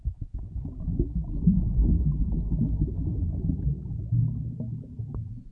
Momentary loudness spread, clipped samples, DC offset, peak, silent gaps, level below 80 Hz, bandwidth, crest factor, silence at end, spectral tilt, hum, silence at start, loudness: 12 LU; under 0.1%; under 0.1%; -8 dBFS; none; -30 dBFS; 1.2 kHz; 18 dB; 0 s; -14 dB/octave; none; 0 s; -29 LUFS